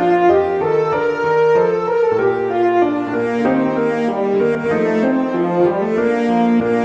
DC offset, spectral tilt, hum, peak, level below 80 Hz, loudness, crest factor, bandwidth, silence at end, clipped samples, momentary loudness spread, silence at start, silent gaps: under 0.1%; -7.5 dB/octave; none; -2 dBFS; -54 dBFS; -16 LUFS; 14 dB; 8 kHz; 0 s; under 0.1%; 4 LU; 0 s; none